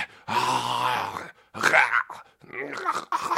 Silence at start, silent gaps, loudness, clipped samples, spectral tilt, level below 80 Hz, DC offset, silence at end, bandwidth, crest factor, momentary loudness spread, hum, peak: 0 s; none; -24 LUFS; under 0.1%; -2.5 dB/octave; -70 dBFS; under 0.1%; 0 s; 16 kHz; 24 dB; 18 LU; none; -2 dBFS